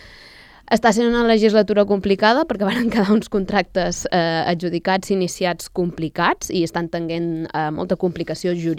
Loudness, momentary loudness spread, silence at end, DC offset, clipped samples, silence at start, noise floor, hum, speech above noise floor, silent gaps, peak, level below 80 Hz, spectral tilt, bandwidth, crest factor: -19 LUFS; 8 LU; 0 s; under 0.1%; under 0.1%; 0 s; -45 dBFS; none; 26 dB; none; -2 dBFS; -46 dBFS; -5 dB/octave; 15.5 kHz; 18 dB